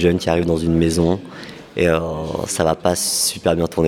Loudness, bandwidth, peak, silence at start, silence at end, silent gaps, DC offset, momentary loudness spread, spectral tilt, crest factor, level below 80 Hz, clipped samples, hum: -18 LUFS; 17 kHz; -2 dBFS; 0 s; 0 s; none; under 0.1%; 8 LU; -4.5 dB/octave; 18 dB; -38 dBFS; under 0.1%; none